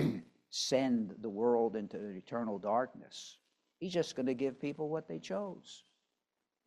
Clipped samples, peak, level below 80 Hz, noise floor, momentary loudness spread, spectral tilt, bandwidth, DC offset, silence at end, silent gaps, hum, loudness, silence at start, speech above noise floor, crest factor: under 0.1%; -18 dBFS; -76 dBFS; -88 dBFS; 17 LU; -5 dB/octave; 13.5 kHz; under 0.1%; 0.85 s; none; none; -36 LUFS; 0 s; 52 dB; 18 dB